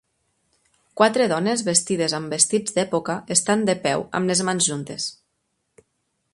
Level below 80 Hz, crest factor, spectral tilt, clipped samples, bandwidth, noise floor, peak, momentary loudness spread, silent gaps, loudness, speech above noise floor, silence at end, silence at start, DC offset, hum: -64 dBFS; 22 dB; -3 dB/octave; under 0.1%; 11.5 kHz; -74 dBFS; -2 dBFS; 8 LU; none; -21 LUFS; 52 dB; 1.2 s; 0.95 s; under 0.1%; none